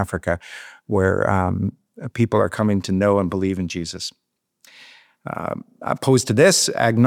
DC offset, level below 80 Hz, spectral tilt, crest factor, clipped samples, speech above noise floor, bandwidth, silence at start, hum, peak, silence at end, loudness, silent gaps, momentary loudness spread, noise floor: under 0.1%; -54 dBFS; -5 dB/octave; 18 dB; under 0.1%; 37 dB; 17.5 kHz; 0 s; none; -2 dBFS; 0 s; -20 LUFS; none; 17 LU; -56 dBFS